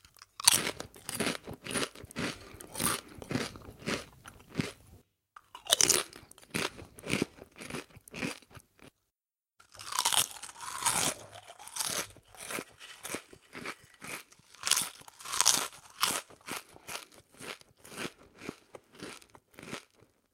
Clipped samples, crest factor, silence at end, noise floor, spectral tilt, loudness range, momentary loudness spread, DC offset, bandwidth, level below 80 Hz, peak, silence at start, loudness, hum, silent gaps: under 0.1%; 36 dB; 0.55 s; under -90 dBFS; -1 dB/octave; 8 LU; 22 LU; under 0.1%; 17 kHz; -64 dBFS; 0 dBFS; 0.2 s; -32 LUFS; none; none